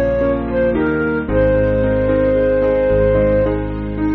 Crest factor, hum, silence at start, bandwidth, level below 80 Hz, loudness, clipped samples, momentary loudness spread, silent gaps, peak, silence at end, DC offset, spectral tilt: 12 dB; none; 0 s; 4.4 kHz; -26 dBFS; -16 LUFS; under 0.1%; 4 LU; none; -4 dBFS; 0 s; under 0.1%; -7.5 dB/octave